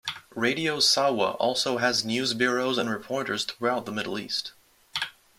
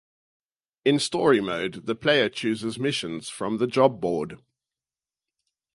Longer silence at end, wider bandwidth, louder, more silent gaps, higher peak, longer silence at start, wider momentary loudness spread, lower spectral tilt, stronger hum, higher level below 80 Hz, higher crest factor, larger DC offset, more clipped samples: second, 0.3 s vs 1.4 s; first, 16.5 kHz vs 11.5 kHz; about the same, -26 LUFS vs -24 LUFS; neither; second, -8 dBFS vs -4 dBFS; second, 0.05 s vs 0.85 s; about the same, 11 LU vs 9 LU; second, -2.5 dB/octave vs -4.5 dB/octave; neither; about the same, -68 dBFS vs -64 dBFS; about the same, 20 dB vs 22 dB; neither; neither